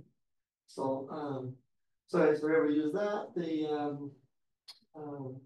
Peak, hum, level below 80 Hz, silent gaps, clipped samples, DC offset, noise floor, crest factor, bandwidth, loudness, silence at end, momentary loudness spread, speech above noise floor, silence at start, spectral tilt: -16 dBFS; none; -84 dBFS; none; under 0.1%; under 0.1%; -85 dBFS; 18 dB; 10.5 kHz; -33 LUFS; 0.05 s; 19 LU; 53 dB; 0.7 s; -7.5 dB/octave